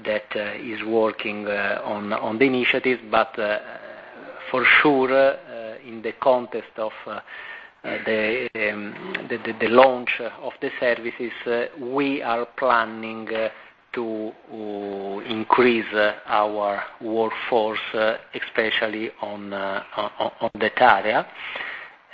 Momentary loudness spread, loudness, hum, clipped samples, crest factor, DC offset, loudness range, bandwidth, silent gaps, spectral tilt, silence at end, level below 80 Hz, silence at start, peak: 15 LU; -23 LUFS; none; under 0.1%; 22 dB; under 0.1%; 5 LU; 5.2 kHz; none; -7 dB/octave; 0.2 s; -62 dBFS; 0 s; 0 dBFS